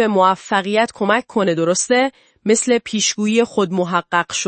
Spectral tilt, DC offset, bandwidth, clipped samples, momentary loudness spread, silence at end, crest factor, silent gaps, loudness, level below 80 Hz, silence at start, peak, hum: -3.5 dB/octave; under 0.1%; 8.8 kHz; under 0.1%; 4 LU; 0 s; 16 dB; none; -17 LUFS; -62 dBFS; 0 s; 0 dBFS; none